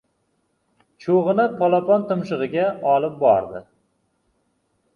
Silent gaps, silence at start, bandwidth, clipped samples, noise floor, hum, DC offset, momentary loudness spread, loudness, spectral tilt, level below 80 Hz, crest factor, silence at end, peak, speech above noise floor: none; 1 s; 7 kHz; under 0.1%; -69 dBFS; none; under 0.1%; 9 LU; -20 LUFS; -8.5 dB/octave; -64 dBFS; 18 dB; 1.35 s; -4 dBFS; 50 dB